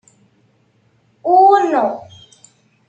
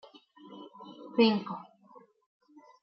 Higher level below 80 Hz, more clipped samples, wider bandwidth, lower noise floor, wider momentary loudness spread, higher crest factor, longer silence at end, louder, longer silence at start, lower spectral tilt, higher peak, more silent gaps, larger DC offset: first, -70 dBFS vs -86 dBFS; neither; first, 8.2 kHz vs 5.8 kHz; about the same, -58 dBFS vs -58 dBFS; second, 16 LU vs 24 LU; second, 16 dB vs 22 dB; second, 0.9 s vs 1.2 s; first, -13 LUFS vs -28 LUFS; first, 1.25 s vs 0.5 s; about the same, -5 dB/octave vs -4 dB/octave; first, -2 dBFS vs -12 dBFS; neither; neither